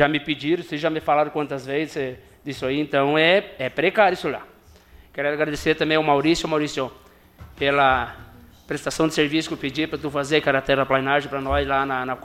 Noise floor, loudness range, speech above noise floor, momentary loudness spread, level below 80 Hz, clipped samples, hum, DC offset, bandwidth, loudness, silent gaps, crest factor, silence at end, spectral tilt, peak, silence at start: -49 dBFS; 2 LU; 28 dB; 11 LU; -46 dBFS; under 0.1%; none; under 0.1%; 15.5 kHz; -22 LUFS; none; 20 dB; 0.05 s; -5 dB/octave; -2 dBFS; 0 s